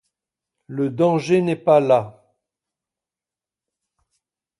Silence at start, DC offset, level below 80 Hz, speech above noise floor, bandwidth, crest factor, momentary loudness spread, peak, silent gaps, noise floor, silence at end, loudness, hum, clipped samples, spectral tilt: 0.7 s; under 0.1%; -66 dBFS; over 72 dB; 11.5 kHz; 20 dB; 13 LU; -4 dBFS; none; under -90 dBFS; 2.5 s; -19 LUFS; none; under 0.1%; -7.5 dB/octave